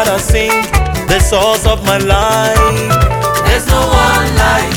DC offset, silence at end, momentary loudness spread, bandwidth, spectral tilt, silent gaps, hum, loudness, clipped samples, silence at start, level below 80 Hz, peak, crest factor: under 0.1%; 0 s; 3 LU; 19 kHz; -4 dB/octave; none; none; -11 LUFS; under 0.1%; 0 s; -16 dBFS; 0 dBFS; 10 dB